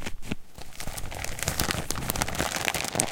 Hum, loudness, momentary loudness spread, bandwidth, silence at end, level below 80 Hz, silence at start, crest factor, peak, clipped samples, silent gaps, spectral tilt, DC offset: none; -30 LUFS; 12 LU; 17 kHz; 0 s; -40 dBFS; 0 s; 28 dB; -2 dBFS; under 0.1%; none; -2.5 dB/octave; under 0.1%